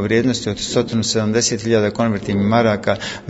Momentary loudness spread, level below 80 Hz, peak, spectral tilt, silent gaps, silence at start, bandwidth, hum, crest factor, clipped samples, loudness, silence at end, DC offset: 4 LU; -46 dBFS; -2 dBFS; -4.5 dB/octave; none; 0 s; 8 kHz; none; 16 dB; under 0.1%; -18 LUFS; 0 s; under 0.1%